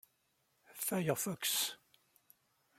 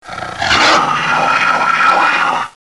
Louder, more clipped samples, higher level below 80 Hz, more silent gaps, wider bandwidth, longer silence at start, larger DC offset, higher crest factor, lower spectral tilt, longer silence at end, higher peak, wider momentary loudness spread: second, -36 LUFS vs -11 LUFS; neither; second, -82 dBFS vs -44 dBFS; neither; first, 16.5 kHz vs 12 kHz; first, 0.7 s vs 0.05 s; second, under 0.1% vs 0.4%; first, 22 dB vs 10 dB; about the same, -3 dB/octave vs -2 dB/octave; first, 1.05 s vs 0.2 s; second, -20 dBFS vs -2 dBFS; first, 18 LU vs 9 LU